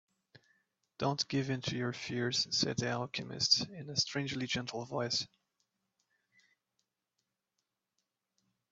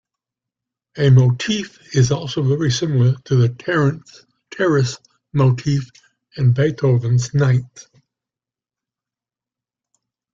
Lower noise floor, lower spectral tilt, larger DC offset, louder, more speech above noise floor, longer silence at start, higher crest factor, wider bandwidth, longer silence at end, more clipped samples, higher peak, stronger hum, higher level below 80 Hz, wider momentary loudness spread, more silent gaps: about the same, -87 dBFS vs -89 dBFS; second, -3.5 dB/octave vs -6.5 dB/octave; neither; second, -34 LUFS vs -18 LUFS; second, 51 dB vs 73 dB; second, 0.35 s vs 0.95 s; first, 24 dB vs 16 dB; about the same, 8 kHz vs 7.6 kHz; first, 3.45 s vs 2.5 s; neither; second, -14 dBFS vs -2 dBFS; neither; second, -72 dBFS vs -52 dBFS; second, 9 LU vs 13 LU; neither